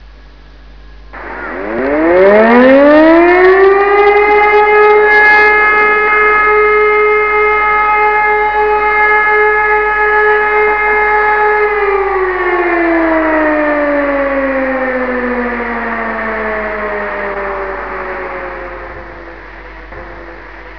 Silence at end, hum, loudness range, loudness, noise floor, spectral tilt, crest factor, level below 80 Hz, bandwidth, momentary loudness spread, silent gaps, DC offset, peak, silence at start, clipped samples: 0 s; none; 12 LU; -9 LUFS; -36 dBFS; -7 dB/octave; 10 dB; -36 dBFS; 5.4 kHz; 18 LU; none; 0.9%; 0 dBFS; 0 s; 0.3%